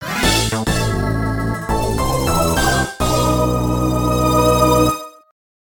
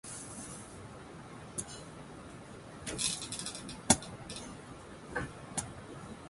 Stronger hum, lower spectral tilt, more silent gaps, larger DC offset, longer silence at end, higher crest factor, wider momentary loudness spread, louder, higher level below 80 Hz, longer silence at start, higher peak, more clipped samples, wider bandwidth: neither; first, -5 dB/octave vs -2.5 dB/octave; neither; first, 0.1% vs under 0.1%; first, 0.55 s vs 0 s; second, 16 dB vs 32 dB; second, 7 LU vs 20 LU; first, -17 LUFS vs -37 LUFS; first, -26 dBFS vs -58 dBFS; about the same, 0 s vs 0.05 s; first, 0 dBFS vs -8 dBFS; neither; first, 17.5 kHz vs 12 kHz